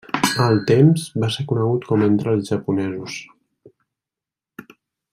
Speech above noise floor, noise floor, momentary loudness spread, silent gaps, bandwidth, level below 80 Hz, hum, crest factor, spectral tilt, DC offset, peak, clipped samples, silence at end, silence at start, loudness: 70 dB; -88 dBFS; 12 LU; none; 16 kHz; -58 dBFS; none; 18 dB; -6 dB/octave; under 0.1%; -2 dBFS; under 0.1%; 0.5 s; 0.15 s; -19 LUFS